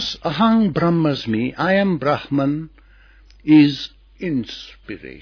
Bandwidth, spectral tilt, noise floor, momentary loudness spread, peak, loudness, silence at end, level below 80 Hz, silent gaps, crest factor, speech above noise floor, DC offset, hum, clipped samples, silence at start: 5.4 kHz; -7 dB/octave; -48 dBFS; 20 LU; -2 dBFS; -18 LUFS; 0 s; -48 dBFS; none; 16 dB; 30 dB; under 0.1%; none; under 0.1%; 0 s